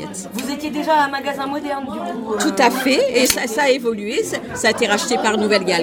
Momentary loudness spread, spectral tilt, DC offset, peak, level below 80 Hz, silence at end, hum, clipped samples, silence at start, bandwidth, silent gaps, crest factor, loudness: 9 LU; -3 dB/octave; under 0.1%; 0 dBFS; -54 dBFS; 0 s; none; under 0.1%; 0 s; 17.5 kHz; none; 18 dB; -18 LUFS